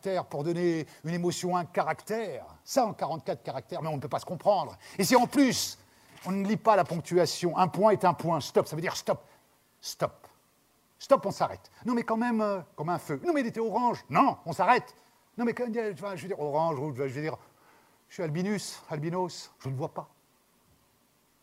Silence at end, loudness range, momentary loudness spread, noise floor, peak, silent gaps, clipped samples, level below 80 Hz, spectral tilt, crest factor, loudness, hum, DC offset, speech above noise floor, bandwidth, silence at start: 1.35 s; 7 LU; 13 LU; -67 dBFS; -8 dBFS; none; under 0.1%; -72 dBFS; -5 dB/octave; 22 dB; -29 LUFS; none; under 0.1%; 39 dB; 16 kHz; 0.05 s